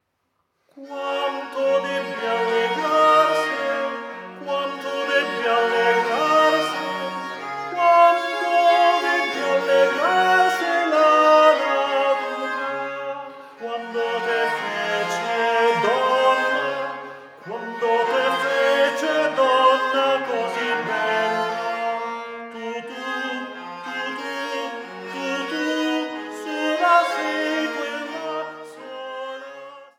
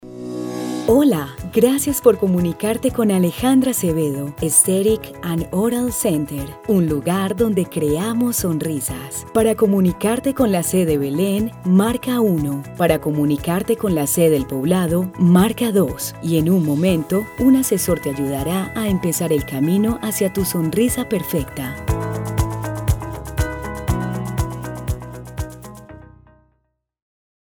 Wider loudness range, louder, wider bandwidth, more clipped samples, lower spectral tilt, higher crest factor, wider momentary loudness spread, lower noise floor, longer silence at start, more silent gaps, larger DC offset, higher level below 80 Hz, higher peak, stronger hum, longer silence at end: about the same, 8 LU vs 7 LU; about the same, -21 LUFS vs -19 LUFS; second, 17.5 kHz vs 19.5 kHz; neither; second, -3 dB/octave vs -5.5 dB/octave; about the same, 18 dB vs 18 dB; first, 15 LU vs 10 LU; about the same, -72 dBFS vs -69 dBFS; first, 0.75 s vs 0.05 s; neither; neither; second, -86 dBFS vs -36 dBFS; about the same, -2 dBFS vs 0 dBFS; neither; second, 0.1 s vs 1.5 s